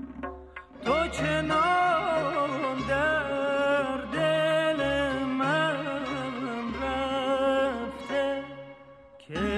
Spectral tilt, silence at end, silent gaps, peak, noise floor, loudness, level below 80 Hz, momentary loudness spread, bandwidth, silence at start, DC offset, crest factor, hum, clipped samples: -5 dB/octave; 0 s; none; -14 dBFS; -51 dBFS; -27 LUFS; -50 dBFS; 12 LU; 12 kHz; 0 s; under 0.1%; 14 dB; none; under 0.1%